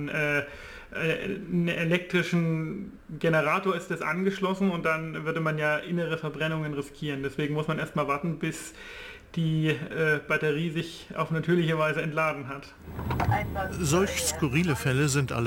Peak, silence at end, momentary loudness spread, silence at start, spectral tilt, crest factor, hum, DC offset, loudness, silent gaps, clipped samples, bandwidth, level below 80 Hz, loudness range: -12 dBFS; 0 s; 11 LU; 0 s; -5.5 dB/octave; 16 dB; none; under 0.1%; -28 LUFS; none; under 0.1%; 17 kHz; -48 dBFS; 3 LU